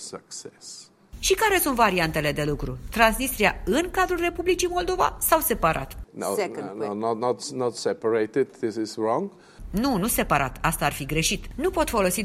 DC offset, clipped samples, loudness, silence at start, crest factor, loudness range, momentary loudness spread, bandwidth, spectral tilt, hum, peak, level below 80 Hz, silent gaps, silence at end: under 0.1%; under 0.1%; -24 LUFS; 0 s; 24 dB; 4 LU; 11 LU; 16 kHz; -3.5 dB/octave; none; -2 dBFS; -40 dBFS; none; 0 s